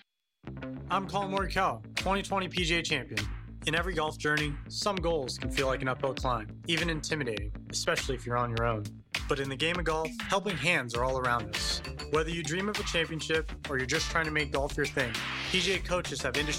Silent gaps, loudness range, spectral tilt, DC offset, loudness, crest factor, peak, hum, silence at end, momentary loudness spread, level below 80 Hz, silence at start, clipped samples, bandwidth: none; 2 LU; -4 dB/octave; under 0.1%; -31 LUFS; 18 dB; -14 dBFS; none; 0 s; 6 LU; -44 dBFS; 0.45 s; under 0.1%; 16 kHz